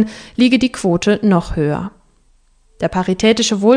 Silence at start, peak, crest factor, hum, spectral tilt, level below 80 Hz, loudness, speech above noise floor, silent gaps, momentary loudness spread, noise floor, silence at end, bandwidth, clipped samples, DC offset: 0 s; 0 dBFS; 16 dB; none; -5 dB/octave; -38 dBFS; -16 LUFS; 39 dB; none; 8 LU; -53 dBFS; 0 s; 10 kHz; under 0.1%; under 0.1%